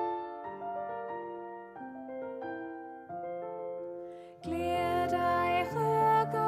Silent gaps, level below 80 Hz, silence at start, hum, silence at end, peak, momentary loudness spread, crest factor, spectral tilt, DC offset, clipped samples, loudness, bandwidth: none; -64 dBFS; 0 s; none; 0 s; -18 dBFS; 16 LU; 16 dB; -6.5 dB/octave; under 0.1%; under 0.1%; -33 LUFS; 14.5 kHz